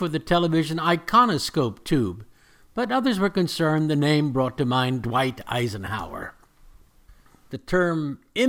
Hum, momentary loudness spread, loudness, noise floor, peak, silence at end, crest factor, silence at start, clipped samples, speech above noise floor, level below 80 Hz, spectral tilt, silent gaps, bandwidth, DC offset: none; 12 LU; -23 LUFS; -53 dBFS; -6 dBFS; 0 s; 18 dB; 0 s; under 0.1%; 30 dB; -48 dBFS; -6 dB/octave; none; 17.5 kHz; under 0.1%